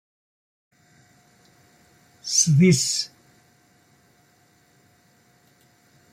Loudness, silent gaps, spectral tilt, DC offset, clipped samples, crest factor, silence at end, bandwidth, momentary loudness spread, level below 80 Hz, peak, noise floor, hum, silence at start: -19 LUFS; none; -4 dB/octave; under 0.1%; under 0.1%; 20 dB; 3.05 s; 15 kHz; 17 LU; -64 dBFS; -6 dBFS; -60 dBFS; none; 2.25 s